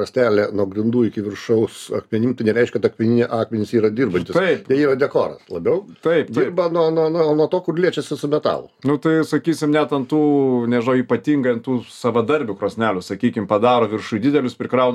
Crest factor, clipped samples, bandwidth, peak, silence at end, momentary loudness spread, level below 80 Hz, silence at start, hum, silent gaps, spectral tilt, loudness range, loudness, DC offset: 16 dB; under 0.1%; 13 kHz; -2 dBFS; 0 s; 5 LU; -62 dBFS; 0 s; none; none; -7 dB/octave; 1 LU; -19 LUFS; under 0.1%